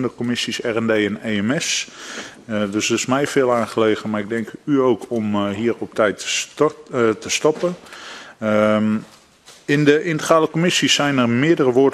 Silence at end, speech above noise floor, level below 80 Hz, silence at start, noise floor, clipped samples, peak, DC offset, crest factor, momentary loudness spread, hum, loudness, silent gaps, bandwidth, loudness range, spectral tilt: 0 s; 29 dB; -60 dBFS; 0 s; -47 dBFS; under 0.1%; 0 dBFS; under 0.1%; 18 dB; 10 LU; none; -19 LUFS; none; 13.5 kHz; 3 LU; -4 dB/octave